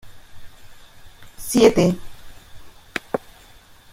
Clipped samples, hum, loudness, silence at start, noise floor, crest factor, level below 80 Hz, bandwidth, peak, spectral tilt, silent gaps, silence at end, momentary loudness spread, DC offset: under 0.1%; none; -20 LUFS; 0.05 s; -47 dBFS; 22 dB; -46 dBFS; 16.5 kHz; -2 dBFS; -5 dB/octave; none; 0.75 s; 17 LU; under 0.1%